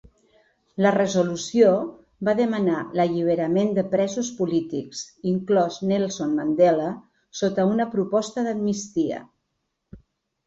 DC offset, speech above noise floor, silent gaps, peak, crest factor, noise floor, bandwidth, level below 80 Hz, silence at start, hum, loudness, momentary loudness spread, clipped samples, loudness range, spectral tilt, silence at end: under 0.1%; 55 dB; none; -6 dBFS; 18 dB; -77 dBFS; 8 kHz; -62 dBFS; 0.75 s; none; -23 LUFS; 11 LU; under 0.1%; 3 LU; -6 dB/octave; 0.5 s